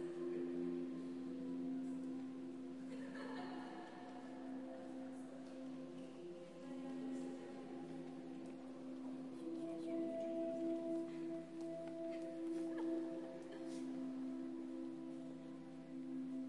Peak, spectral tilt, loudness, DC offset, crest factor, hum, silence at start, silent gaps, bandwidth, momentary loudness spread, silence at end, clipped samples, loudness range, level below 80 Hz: -32 dBFS; -6.5 dB/octave; -48 LUFS; under 0.1%; 14 dB; none; 0 s; none; 11.5 kHz; 9 LU; 0 s; under 0.1%; 5 LU; under -90 dBFS